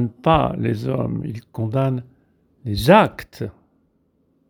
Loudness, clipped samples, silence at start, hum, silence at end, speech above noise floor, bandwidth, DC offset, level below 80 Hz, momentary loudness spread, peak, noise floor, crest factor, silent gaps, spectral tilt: -20 LUFS; under 0.1%; 0 s; none; 1 s; 45 dB; 19.5 kHz; under 0.1%; -42 dBFS; 18 LU; 0 dBFS; -64 dBFS; 20 dB; none; -7 dB/octave